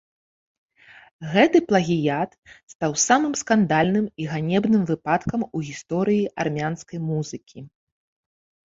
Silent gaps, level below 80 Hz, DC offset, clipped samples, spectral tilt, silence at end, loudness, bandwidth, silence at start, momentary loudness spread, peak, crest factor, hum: 2.38-2.42 s, 2.63-2.67 s, 2.75-2.80 s; -56 dBFS; under 0.1%; under 0.1%; -5 dB/octave; 1.05 s; -22 LUFS; 7.8 kHz; 1.2 s; 11 LU; -2 dBFS; 20 dB; none